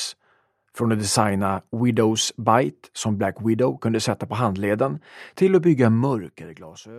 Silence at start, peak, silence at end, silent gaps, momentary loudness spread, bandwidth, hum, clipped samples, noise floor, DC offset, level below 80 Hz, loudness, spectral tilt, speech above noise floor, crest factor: 0 s; -2 dBFS; 0 s; none; 13 LU; 14 kHz; none; under 0.1%; -64 dBFS; under 0.1%; -62 dBFS; -22 LUFS; -5.5 dB/octave; 43 dB; 20 dB